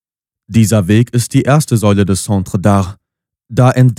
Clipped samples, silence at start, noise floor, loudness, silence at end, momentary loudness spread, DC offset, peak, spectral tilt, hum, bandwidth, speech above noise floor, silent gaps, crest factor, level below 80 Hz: under 0.1%; 0.5 s; -53 dBFS; -12 LUFS; 0.05 s; 5 LU; under 0.1%; 0 dBFS; -6.5 dB/octave; none; 15 kHz; 42 dB; none; 12 dB; -44 dBFS